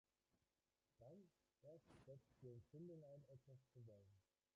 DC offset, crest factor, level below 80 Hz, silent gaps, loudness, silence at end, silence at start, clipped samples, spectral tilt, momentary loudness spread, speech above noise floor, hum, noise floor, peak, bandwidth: under 0.1%; 16 dB; -88 dBFS; none; -65 LUFS; 0.35 s; 0.35 s; under 0.1%; -9 dB/octave; 7 LU; over 26 dB; none; under -90 dBFS; -50 dBFS; 7 kHz